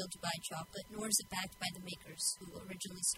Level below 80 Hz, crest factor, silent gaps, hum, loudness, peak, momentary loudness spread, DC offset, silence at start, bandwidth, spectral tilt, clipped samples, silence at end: -68 dBFS; 24 dB; none; none; -39 LUFS; -16 dBFS; 13 LU; under 0.1%; 0 s; 16 kHz; -1.5 dB/octave; under 0.1%; 0 s